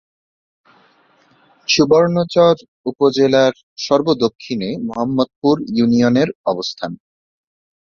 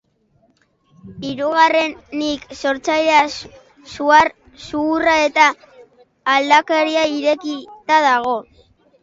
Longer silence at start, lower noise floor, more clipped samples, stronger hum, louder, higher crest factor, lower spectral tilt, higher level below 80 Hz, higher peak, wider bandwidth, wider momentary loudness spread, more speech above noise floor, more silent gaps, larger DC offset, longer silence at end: first, 1.7 s vs 1.05 s; second, -55 dBFS vs -60 dBFS; neither; neither; about the same, -16 LUFS vs -16 LUFS; about the same, 16 dB vs 18 dB; first, -5.5 dB/octave vs -3 dB/octave; about the same, -54 dBFS vs -54 dBFS; about the same, -2 dBFS vs 0 dBFS; about the same, 7.2 kHz vs 7.8 kHz; about the same, 13 LU vs 14 LU; second, 39 dB vs 43 dB; first, 2.68-2.84 s, 3.63-3.76 s, 4.35-4.39 s, 5.36-5.42 s, 6.35-6.44 s vs none; neither; first, 1 s vs 0.6 s